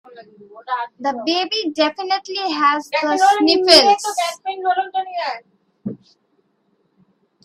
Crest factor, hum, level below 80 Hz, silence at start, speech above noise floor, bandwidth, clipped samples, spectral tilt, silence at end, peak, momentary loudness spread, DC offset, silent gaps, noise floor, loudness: 20 dB; none; -62 dBFS; 0.15 s; 47 dB; 15.5 kHz; under 0.1%; -2 dB/octave; 1.5 s; 0 dBFS; 17 LU; under 0.1%; none; -64 dBFS; -17 LUFS